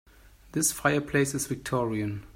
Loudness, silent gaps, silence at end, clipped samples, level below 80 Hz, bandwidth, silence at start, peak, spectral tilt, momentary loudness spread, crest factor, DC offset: -28 LUFS; none; 0.05 s; under 0.1%; -54 dBFS; 16.5 kHz; 0.55 s; -10 dBFS; -4 dB/octave; 7 LU; 18 dB; under 0.1%